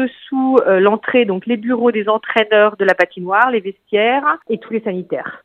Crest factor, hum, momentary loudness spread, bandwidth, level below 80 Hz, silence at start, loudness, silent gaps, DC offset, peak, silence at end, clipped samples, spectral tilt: 16 dB; none; 9 LU; 7.4 kHz; -70 dBFS; 0 s; -15 LUFS; none; under 0.1%; 0 dBFS; 0.05 s; under 0.1%; -7 dB/octave